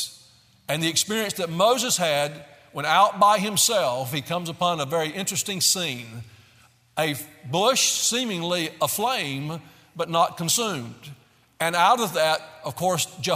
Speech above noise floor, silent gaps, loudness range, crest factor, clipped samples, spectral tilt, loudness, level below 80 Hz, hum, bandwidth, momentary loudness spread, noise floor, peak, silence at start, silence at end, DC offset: 33 dB; none; 4 LU; 20 dB; under 0.1%; -2.5 dB/octave; -23 LUFS; -68 dBFS; none; 16 kHz; 15 LU; -57 dBFS; -4 dBFS; 0 s; 0 s; under 0.1%